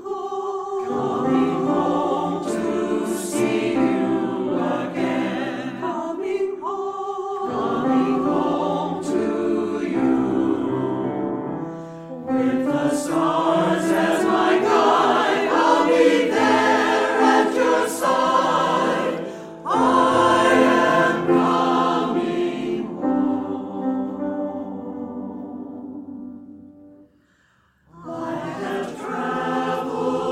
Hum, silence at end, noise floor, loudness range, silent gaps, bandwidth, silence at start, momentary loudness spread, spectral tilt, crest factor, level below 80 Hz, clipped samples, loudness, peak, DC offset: none; 0 s; -60 dBFS; 12 LU; none; 15 kHz; 0 s; 14 LU; -5 dB/octave; 18 dB; -62 dBFS; under 0.1%; -21 LUFS; -2 dBFS; under 0.1%